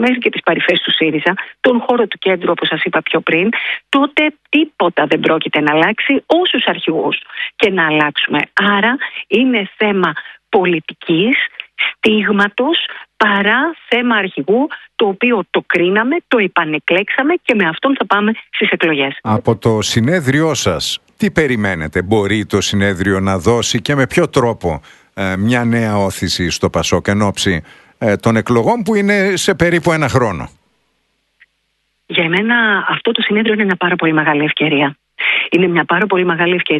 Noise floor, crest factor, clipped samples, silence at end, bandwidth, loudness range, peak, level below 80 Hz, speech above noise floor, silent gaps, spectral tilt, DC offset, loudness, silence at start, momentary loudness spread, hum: -66 dBFS; 14 dB; under 0.1%; 0 s; 12 kHz; 2 LU; 0 dBFS; -44 dBFS; 52 dB; none; -4.5 dB/octave; under 0.1%; -14 LUFS; 0 s; 5 LU; none